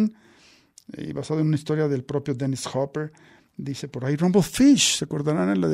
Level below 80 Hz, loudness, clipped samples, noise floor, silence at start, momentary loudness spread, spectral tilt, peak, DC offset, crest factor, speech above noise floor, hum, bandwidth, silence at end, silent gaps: -56 dBFS; -23 LUFS; under 0.1%; -55 dBFS; 0 s; 17 LU; -5 dB/octave; -8 dBFS; under 0.1%; 16 dB; 33 dB; none; 15.5 kHz; 0 s; none